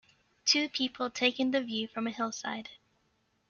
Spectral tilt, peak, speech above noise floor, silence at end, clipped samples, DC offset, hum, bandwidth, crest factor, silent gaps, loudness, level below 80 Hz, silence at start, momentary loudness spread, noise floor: -2 dB/octave; -10 dBFS; 41 dB; 0.75 s; under 0.1%; under 0.1%; none; 7.2 kHz; 22 dB; none; -31 LUFS; -76 dBFS; 0.45 s; 11 LU; -74 dBFS